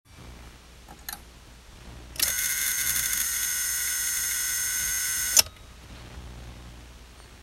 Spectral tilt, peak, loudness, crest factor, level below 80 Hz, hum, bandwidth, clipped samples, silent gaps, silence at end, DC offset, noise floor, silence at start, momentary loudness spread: 1 dB/octave; 0 dBFS; -24 LUFS; 30 dB; -48 dBFS; 60 Hz at -50 dBFS; 16.5 kHz; under 0.1%; none; 0 s; under 0.1%; -49 dBFS; 0.1 s; 25 LU